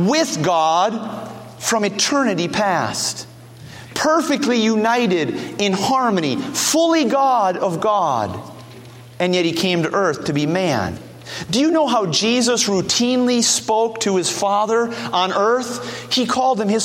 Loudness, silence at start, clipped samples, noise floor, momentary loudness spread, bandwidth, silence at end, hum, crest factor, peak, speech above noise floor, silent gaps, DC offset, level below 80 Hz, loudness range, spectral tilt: -18 LUFS; 0 s; under 0.1%; -39 dBFS; 11 LU; 16.5 kHz; 0 s; none; 18 dB; -2 dBFS; 21 dB; none; under 0.1%; -58 dBFS; 3 LU; -3.5 dB/octave